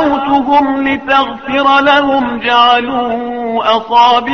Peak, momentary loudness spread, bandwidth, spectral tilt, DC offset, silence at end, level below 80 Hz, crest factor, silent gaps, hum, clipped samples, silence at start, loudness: 0 dBFS; 7 LU; 6.8 kHz; -4.5 dB/octave; 0.4%; 0 s; -44 dBFS; 10 dB; none; none; under 0.1%; 0 s; -11 LUFS